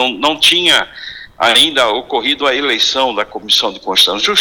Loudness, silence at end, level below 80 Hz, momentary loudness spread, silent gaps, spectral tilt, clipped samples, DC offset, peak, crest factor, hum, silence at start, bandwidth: -11 LUFS; 0 s; -50 dBFS; 8 LU; none; -1 dB/octave; under 0.1%; under 0.1%; -2 dBFS; 12 dB; none; 0 s; 19 kHz